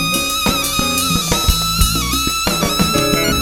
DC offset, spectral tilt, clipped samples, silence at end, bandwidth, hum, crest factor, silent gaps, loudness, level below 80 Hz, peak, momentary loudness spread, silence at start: under 0.1%; -3 dB/octave; under 0.1%; 0 s; over 20 kHz; none; 16 dB; none; -15 LUFS; -24 dBFS; 0 dBFS; 2 LU; 0 s